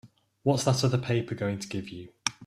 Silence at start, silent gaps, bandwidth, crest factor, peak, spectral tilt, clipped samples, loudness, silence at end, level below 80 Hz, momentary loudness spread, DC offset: 0.05 s; none; 14 kHz; 22 dB; -6 dBFS; -5 dB/octave; under 0.1%; -29 LUFS; 0 s; -60 dBFS; 11 LU; under 0.1%